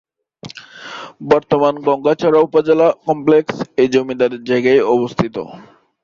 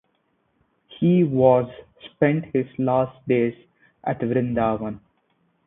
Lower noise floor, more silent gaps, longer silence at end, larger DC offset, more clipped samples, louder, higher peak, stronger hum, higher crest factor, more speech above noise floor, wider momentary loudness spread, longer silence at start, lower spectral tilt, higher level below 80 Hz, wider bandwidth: second, -38 dBFS vs -69 dBFS; neither; second, 0.4 s vs 0.7 s; neither; neither; first, -15 LUFS vs -22 LUFS; about the same, -2 dBFS vs -2 dBFS; neither; second, 14 dB vs 20 dB; second, 23 dB vs 48 dB; first, 19 LU vs 15 LU; second, 0.45 s vs 0.9 s; second, -6.5 dB/octave vs -12.5 dB/octave; about the same, -54 dBFS vs -56 dBFS; first, 7.4 kHz vs 3.9 kHz